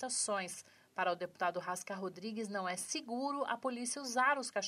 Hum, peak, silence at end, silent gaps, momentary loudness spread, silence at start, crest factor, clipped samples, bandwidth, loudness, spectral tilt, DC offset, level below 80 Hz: none; -20 dBFS; 0 s; none; 10 LU; 0 s; 18 dB; under 0.1%; 15.5 kHz; -38 LUFS; -2 dB/octave; under 0.1%; under -90 dBFS